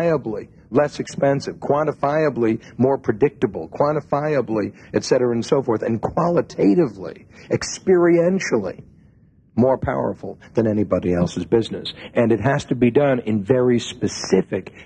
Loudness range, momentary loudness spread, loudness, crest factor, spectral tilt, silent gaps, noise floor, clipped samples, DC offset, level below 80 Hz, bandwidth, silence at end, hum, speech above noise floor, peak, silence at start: 2 LU; 8 LU; -20 LUFS; 16 dB; -6.5 dB/octave; none; -53 dBFS; under 0.1%; under 0.1%; -48 dBFS; 9.4 kHz; 0 s; none; 33 dB; -2 dBFS; 0 s